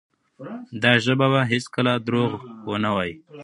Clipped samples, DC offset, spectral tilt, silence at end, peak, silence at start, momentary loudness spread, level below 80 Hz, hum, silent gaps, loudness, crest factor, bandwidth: under 0.1%; under 0.1%; -6 dB/octave; 0 s; 0 dBFS; 0.4 s; 17 LU; -58 dBFS; none; none; -21 LUFS; 22 dB; 11 kHz